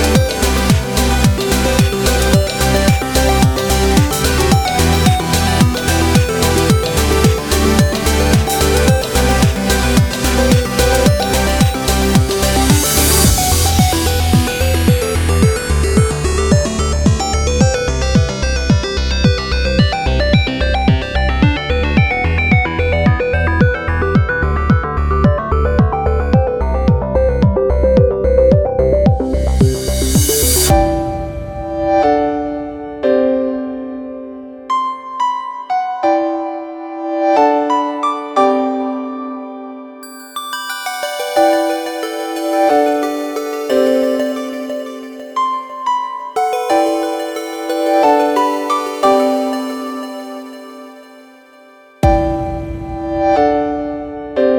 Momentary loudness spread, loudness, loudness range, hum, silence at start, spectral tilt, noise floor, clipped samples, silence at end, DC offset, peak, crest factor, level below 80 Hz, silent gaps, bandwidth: 11 LU; -14 LUFS; 6 LU; none; 0 s; -5 dB/octave; -43 dBFS; under 0.1%; 0 s; under 0.1%; 0 dBFS; 14 dB; -22 dBFS; none; 19 kHz